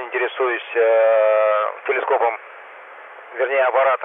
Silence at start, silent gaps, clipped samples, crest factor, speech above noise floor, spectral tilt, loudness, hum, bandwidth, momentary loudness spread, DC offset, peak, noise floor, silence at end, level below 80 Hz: 0 s; none; under 0.1%; 12 dB; 22 dB; -4 dB/octave; -18 LUFS; none; 3.8 kHz; 23 LU; under 0.1%; -8 dBFS; -40 dBFS; 0 s; -90 dBFS